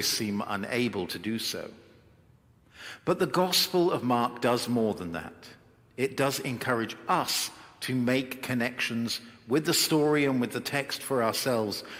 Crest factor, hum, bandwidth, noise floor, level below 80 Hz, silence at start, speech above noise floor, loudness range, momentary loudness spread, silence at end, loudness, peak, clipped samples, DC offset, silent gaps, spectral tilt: 18 dB; none; 16.5 kHz; -60 dBFS; -68 dBFS; 0 s; 32 dB; 3 LU; 11 LU; 0 s; -28 LUFS; -12 dBFS; under 0.1%; under 0.1%; none; -4 dB/octave